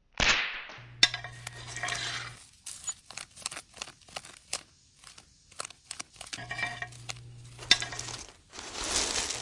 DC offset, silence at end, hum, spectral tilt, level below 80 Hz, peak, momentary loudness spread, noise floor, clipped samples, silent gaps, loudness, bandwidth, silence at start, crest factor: under 0.1%; 0 s; none; -0.5 dB/octave; -54 dBFS; -4 dBFS; 19 LU; -56 dBFS; under 0.1%; none; -31 LUFS; 11.5 kHz; 0.2 s; 30 dB